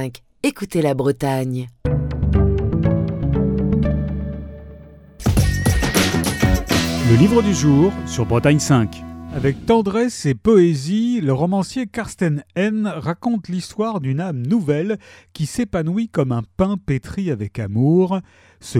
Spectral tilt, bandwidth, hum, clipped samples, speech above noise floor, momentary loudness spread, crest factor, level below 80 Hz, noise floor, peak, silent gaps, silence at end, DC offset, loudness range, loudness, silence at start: -6.5 dB/octave; 17.5 kHz; none; under 0.1%; 22 dB; 10 LU; 16 dB; -30 dBFS; -41 dBFS; -2 dBFS; none; 0 s; under 0.1%; 5 LU; -19 LUFS; 0 s